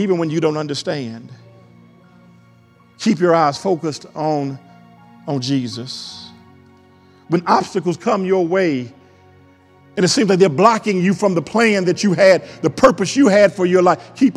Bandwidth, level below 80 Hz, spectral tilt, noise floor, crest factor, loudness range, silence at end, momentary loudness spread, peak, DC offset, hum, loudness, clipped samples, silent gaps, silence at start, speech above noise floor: 12 kHz; -56 dBFS; -5.5 dB/octave; -50 dBFS; 18 dB; 9 LU; 0 s; 15 LU; 0 dBFS; under 0.1%; none; -16 LUFS; under 0.1%; none; 0 s; 34 dB